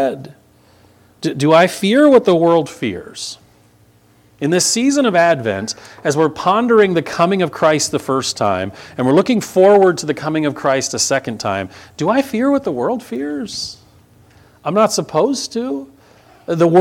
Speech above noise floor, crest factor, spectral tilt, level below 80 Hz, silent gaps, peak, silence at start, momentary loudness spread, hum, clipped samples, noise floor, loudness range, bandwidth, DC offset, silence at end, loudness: 36 dB; 16 dB; -4.5 dB/octave; -58 dBFS; none; 0 dBFS; 0 s; 13 LU; 60 Hz at -50 dBFS; under 0.1%; -51 dBFS; 5 LU; 16.5 kHz; under 0.1%; 0 s; -15 LUFS